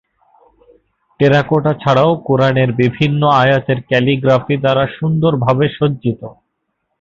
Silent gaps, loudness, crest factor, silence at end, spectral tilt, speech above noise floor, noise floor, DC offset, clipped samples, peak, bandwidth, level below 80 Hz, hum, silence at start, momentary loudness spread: none; -14 LUFS; 14 dB; 0.7 s; -8 dB/octave; 57 dB; -71 dBFS; under 0.1%; under 0.1%; 0 dBFS; 7.2 kHz; -48 dBFS; none; 1.2 s; 5 LU